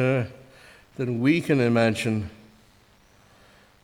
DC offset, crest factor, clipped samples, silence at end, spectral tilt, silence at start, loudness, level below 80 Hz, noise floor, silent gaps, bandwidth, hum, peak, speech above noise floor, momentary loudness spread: under 0.1%; 18 dB; under 0.1%; 1.5 s; -6.5 dB/octave; 0 s; -24 LUFS; -58 dBFS; -57 dBFS; none; 16 kHz; 50 Hz at -55 dBFS; -8 dBFS; 35 dB; 15 LU